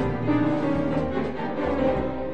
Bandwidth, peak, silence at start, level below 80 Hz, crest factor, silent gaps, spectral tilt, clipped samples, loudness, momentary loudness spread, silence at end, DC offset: 8.4 kHz; -12 dBFS; 0 s; -42 dBFS; 14 dB; none; -8.5 dB/octave; under 0.1%; -25 LUFS; 5 LU; 0 s; 1%